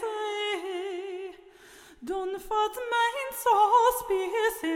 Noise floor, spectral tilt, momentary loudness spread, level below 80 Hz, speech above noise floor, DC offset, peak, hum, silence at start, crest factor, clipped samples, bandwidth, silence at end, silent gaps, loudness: -52 dBFS; -1.5 dB/octave; 15 LU; -60 dBFS; 27 dB; under 0.1%; -10 dBFS; none; 0 s; 18 dB; under 0.1%; 16.5 kHz; 0 s; none; -27 LUFS